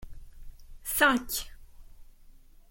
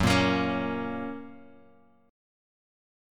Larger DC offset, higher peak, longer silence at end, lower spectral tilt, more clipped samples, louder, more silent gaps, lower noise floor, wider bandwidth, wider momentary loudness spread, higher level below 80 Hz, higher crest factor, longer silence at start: neither; about the same, -8 dBFS vs -8 dBFS; second, 0.4 s vs 1.7 s; second, -1.5 dB/octave vs -5.5 dB/octave; neither; about the same, -27 LUFS vs -28 LUFS; neither; second, -53 dBFS vs -60 dBFS; about the same, 17 kHz vs 17.5 kHz; about the same, 18 LU vs 19 LU; about the same, -48 dBFS vs -52 dBFS; about the same, 24 dB vs 22 dB; about the same, 0 s vs 0 s